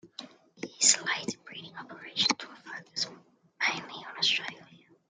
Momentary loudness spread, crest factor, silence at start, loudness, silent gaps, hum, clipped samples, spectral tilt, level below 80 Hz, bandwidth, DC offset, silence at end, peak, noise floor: 21 LU; 28 dB; 0.05 s; -28 LUFS; none; none; under 0.1%; 0.5 dB/octave; -82 dBFS; 12.5 kHz; under 0.1%; 0.3 s; -6 dBFS; -57 dBFS